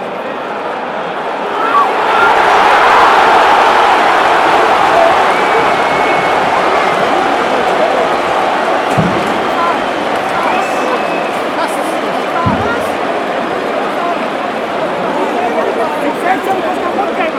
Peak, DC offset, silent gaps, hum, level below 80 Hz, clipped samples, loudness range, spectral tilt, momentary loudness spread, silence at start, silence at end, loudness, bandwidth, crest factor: 0 dBFS; under 0.1%; none; none; -46 dBFS; under 0.1%; 7 LU; -4.5 dB/octave; 9 LU; 0 s; 0 s; -12 LUFS; 16.5 kHz; 12 dB